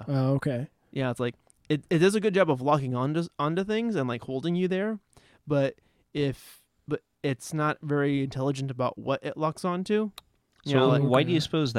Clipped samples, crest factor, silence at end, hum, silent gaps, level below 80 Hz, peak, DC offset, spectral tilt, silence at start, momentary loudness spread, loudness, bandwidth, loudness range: under 0.1%; 18 dB; 0 s; none; none; -62 dBFS; -10 dBFS; under 0.1%; -6.5 dB/octave; 0 s; 10 LU; -27 LUFS; 14 kHz; 5 LU